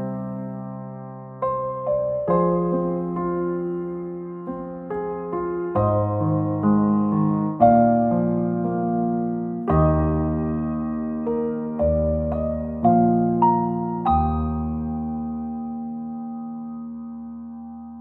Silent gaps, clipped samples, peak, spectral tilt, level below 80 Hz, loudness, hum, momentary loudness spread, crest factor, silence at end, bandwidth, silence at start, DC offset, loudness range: none; under 0.1%; -4 dBFS; -13 dB/octave; -38 dBFS; -23 LUFS; none; 14 LU; 20 dB; 0 s; 4 kHz; 0 s; under 0.1%; 6 LU